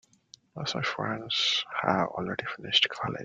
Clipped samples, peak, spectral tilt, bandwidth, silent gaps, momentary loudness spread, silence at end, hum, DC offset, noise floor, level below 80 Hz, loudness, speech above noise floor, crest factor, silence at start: under 0.1%; -6 dBFS; -3.5 dB/octave; 9 kHz; none; 10 LU; 0 s; none; under 0.1%; -58 dBFS; -66 dBFS; -28 LUFS; 28 dB; 24 dB; 0.55 s